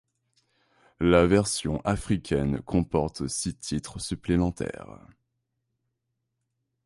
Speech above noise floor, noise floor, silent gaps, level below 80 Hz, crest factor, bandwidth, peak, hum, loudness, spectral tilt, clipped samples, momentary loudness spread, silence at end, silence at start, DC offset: 54 dB; -80 dBFS; none; -44 dBFS; 20 dB; 11.5 kHz; -8 dBFS; none; -26 LUFS; -5.5 dB/octave; under 0.1%; 13 LU; 2.05 s; 1 s; under 0.1%